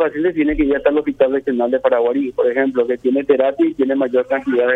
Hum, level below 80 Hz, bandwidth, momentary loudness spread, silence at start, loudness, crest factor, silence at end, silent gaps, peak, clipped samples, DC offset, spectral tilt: none; -42 dBFS; 4 kHz; 3 LU; 0 s; -17 LUFS; 14 dB; 0 s; none; -2 dBFS; under 0.1%; under 0.1%; -7.5 dB/octave